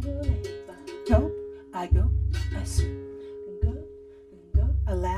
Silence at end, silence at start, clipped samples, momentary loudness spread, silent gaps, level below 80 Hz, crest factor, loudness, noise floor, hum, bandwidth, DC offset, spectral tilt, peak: 0 s; 0 s; under 0.1%; 16 LU; none; -30 dBFS; 20 dB; -28 LUFS; -49 dBFS; none; 12 kHz; under 0.1%; -7 dB/octave; -8 dBFS